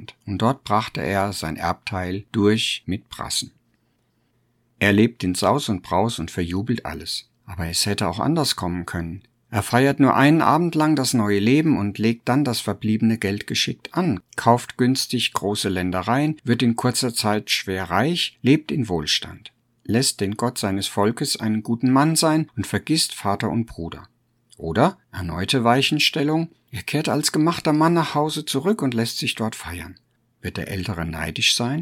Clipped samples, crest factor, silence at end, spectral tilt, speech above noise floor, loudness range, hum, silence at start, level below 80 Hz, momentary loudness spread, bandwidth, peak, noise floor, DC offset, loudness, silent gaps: under 0.1%; 20 dB; 0 s; -4.5 dB/octave; 45 dB; 5 LU; none; 0 s; -50 dBFS; 11 LU; 18 kHz; -2 dBFS; -66 dBFS; under 0.1%; -21 LUFS; none